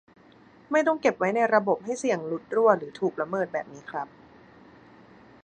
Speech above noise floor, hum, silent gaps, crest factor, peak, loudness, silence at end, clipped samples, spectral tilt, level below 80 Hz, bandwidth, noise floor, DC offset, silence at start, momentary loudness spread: 29 dB; none; none; 22 dB; -6 dBFS; -26 LUFS; 1.35 s; under 0.1%; -5.5 dB/octave; -72 dBFS; 9.6 kHz; -54 dBFS; under 0.1%; 0.7 s; 13 LU